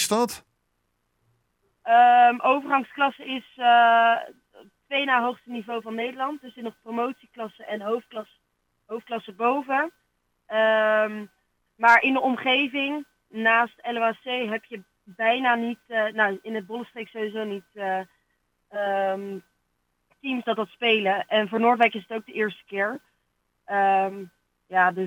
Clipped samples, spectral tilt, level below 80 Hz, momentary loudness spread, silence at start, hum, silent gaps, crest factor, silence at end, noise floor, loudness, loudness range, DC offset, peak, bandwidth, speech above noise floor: under 0.1%; -3.5 dB/octave; -76 dBFS; 19 LU; 0 s; none; none; 20 dB; 0 s; -74 dBFS; -23 LUFS; 10 LU; under 0.1%; -4 dBFS; 16 kHz; 50 dB